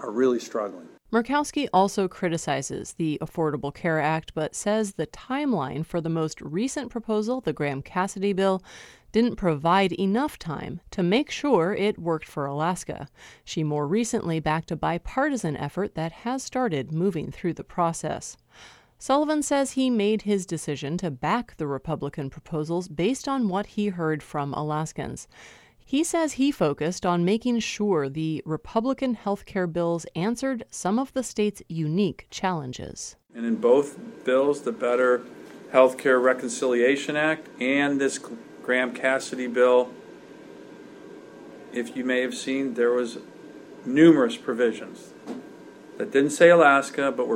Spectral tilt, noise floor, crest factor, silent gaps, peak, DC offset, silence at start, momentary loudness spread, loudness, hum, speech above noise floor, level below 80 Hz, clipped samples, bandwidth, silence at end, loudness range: -5.5 dB/octave; -45 dBFS; 22 dB; none; -4 dBFS; under 0.1%; 0 s; 14 LU; -25 LUFS; none; 20 dB; -56 dBFS; under 0.1%; 15.5 kHz; 0 s; 5 LU